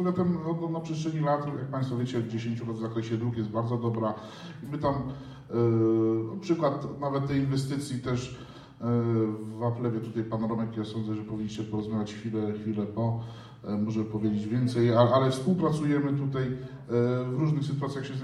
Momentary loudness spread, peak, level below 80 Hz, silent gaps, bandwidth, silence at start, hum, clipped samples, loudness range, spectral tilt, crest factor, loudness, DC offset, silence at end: 9 LU; -8 dBFS; -58 dBFS; none; 11.5 kHz; 0 s; none; under 0.1%; 6 LU; -8 dB/octave; 20 dB; -29 LUFS; under 0.1%; 0 s